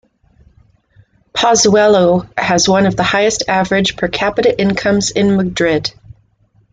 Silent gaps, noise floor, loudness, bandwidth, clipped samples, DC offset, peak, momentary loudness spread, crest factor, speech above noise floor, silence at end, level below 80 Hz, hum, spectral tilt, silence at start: none; -54 dBFS; -13 LUFS; 9.4 kHz; under 0.1%; under 0.1%; -2 dBFS; 6 LU; 12 dB; 42 dB; 0.6 s; -42 dBFS; none; -4 dB/octave; 1.35 s